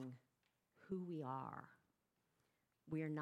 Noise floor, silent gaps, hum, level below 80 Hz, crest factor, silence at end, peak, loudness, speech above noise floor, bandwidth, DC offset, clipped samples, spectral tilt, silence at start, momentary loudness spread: -86 dBFS; none; none; -88 dBFS; 18 dB; 0 s; -34 dBFS; -49 LUFS; 39 dB; 11 kHz; under 0.1%; under 0.1%; -9 dB/octave; 0 s; 15 LU